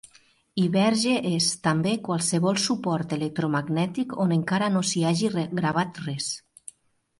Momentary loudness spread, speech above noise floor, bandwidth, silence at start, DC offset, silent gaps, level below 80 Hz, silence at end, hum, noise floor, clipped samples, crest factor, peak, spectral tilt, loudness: 8 LU; 38 dB; 11.5 kHz; 0.55 s; under 0.1%; none; -64 dBFS; 0.8 s; none; -62 dBFS; under 0.1%; 14 dB; -10 dBFS; -4.5 dB/octave; -25 LUFS